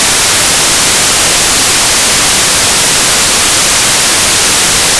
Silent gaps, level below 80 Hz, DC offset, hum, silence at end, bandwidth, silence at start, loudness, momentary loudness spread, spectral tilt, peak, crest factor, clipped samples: none; -30 dBFS; under 0.1%; none; 0 s; 11 kHz; 0 s; -5 LUFS; 0 LU; 0 dB/octave; -4 dBFS; 4 dB; under 0.1%